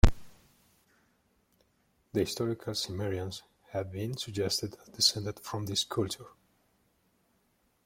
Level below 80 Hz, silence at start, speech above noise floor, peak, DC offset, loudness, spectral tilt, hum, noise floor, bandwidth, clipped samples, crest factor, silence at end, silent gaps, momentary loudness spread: -40 dBFS; 0.05 s; 39 dB; -6 dBFS; under 0.1%; -32 LUFS; -4 dB/octave; none; -73 dBFS; 16.5 kHz; under 0.1%; 26 dB; 1.55 s; none; 13 LU